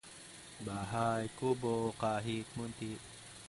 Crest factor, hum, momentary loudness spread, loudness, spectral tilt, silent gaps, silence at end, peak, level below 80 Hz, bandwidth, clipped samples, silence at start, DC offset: 18 dB; none; 16 LU; -38 LUFS; -5.5 dB/octave; none; 0 s; -20 dBFS; -64 dBFS; 11.5 kHz; under 0.1%; 0.05 s; under 0.1%